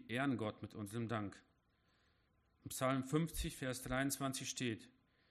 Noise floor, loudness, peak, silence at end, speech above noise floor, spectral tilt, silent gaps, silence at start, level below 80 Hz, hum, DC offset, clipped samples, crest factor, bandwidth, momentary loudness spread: -77 dBFS; -42 LUFS; -24 dBFS; 0.4 s; 36 dB; -4.5 dB/octave; none; 0 s; -60 dBFS; none; under 0.1%; under 0.1%; 20 dB; 14.5 kHz; 10 LU